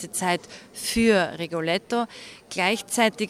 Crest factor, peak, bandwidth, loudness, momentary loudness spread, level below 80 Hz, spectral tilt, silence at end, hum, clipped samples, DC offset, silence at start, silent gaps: 18 dB; -6 dBFS; 16 kHz; -24 LUFS; 13 LU; -52 dBFS; -3.5 dB/octave; 0 s; none; under 0.1%; under 0.1%; 0 s; none